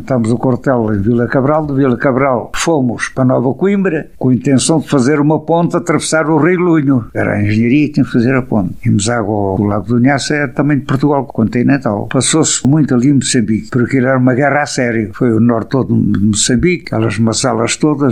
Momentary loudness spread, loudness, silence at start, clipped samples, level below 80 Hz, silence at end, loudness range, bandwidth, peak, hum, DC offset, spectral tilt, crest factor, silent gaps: 4 LU; -13 LUFS; 0 s; under 0.1%; -40 dBFS; 0 s; 1 LU; 12 kHz; 0 dBFS; none; 1%; -5.5 dB/octave; 12 dB; none